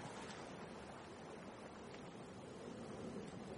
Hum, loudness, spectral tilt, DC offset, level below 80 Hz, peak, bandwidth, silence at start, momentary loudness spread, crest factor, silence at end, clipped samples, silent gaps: none; -53 LUFS; -5 dB/octave; under 0.1%; -72 dBFS; -38 dBFS; 10.5 kHz; 0 s; 4 LU; 14 dB; 0 s; under 0.1%; none